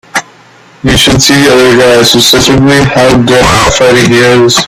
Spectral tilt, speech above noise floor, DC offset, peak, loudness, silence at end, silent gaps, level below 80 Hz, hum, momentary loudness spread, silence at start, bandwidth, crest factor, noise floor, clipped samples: -4 dB/octave; 32 dB; under 0.1%; 0 dBFS; -4 LUFS; 0 s; none; -26 dBFS; none; 3 LU; 0.15 s; over 20 kHz; 6 dB; -37 dBFS; 1%